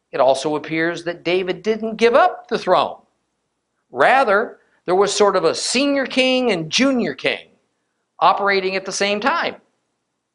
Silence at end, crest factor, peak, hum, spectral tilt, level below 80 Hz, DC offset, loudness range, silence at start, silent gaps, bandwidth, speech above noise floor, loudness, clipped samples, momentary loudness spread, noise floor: 0.8 s; 18 dB; 0 dBFS; none; -3.5 dB/octave; -62 dBFS; under 0.1%; 3 LU; 0.15 s; none; 11 kHz; 56 dB; -18 LUFS; under 0.1%; 8 LU; -73 dBFS